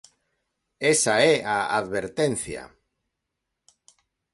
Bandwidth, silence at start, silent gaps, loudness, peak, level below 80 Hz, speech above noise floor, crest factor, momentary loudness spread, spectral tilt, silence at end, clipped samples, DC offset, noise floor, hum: 11.5 kHz; 0.8 s; none; -23 LUFS; -4 dBFS; -60 dBFS; 59 dB; 22 dB; 12 LU; -3 dB/octave; 1.7 s; under 0.1%; under 0.1%; -82 dBFS; none